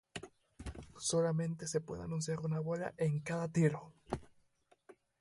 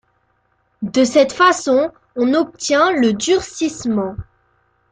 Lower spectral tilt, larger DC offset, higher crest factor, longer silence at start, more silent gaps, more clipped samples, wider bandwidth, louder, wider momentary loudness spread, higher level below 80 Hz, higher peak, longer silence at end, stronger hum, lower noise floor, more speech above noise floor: first, -5.5 dB/octave vs -4 dB/octave; neither; about the same, 20 dB vs 16 dB; second, 0.15 s vs 0.8 s; neither; neither; first, 11.5 kHz vs 9.6 kHz; second, -37 LUFS vs -16 LUFS; first, 17 LU vs 10 LU; second, -60 dBFS vs -50 dBFS; second, -18 dBFS vs -2 dBFS; second, 0.3 s vs 0.7 s; neither; first, -73 dBFS vs -63 dBFS; second, 37 dB vs 47 dB